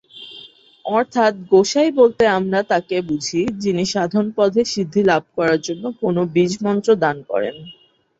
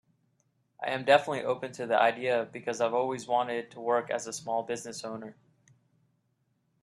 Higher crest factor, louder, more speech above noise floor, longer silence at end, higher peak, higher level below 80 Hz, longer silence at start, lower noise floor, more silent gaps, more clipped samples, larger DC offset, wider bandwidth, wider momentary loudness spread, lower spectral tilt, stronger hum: second, 16 dB vs 24 dB; first, -18 LUFS vs -30 LUFS; second, 26 dB vs 45 dB; second, 0.45 s vs 1.5 s; first, -2 dBFS vs -8 dBFS; first, -56 dBFS vs -78 dBFS; second, 0.15 s vs 0.8 s; second, -43 dBFS vs -75 dBFS; neither; neither; neither; second, 8 kHz vs 12.5 kHz; second, 10 LU vs 14 LU; first, -5 dB/octave vs -3.5 dB/octave; neither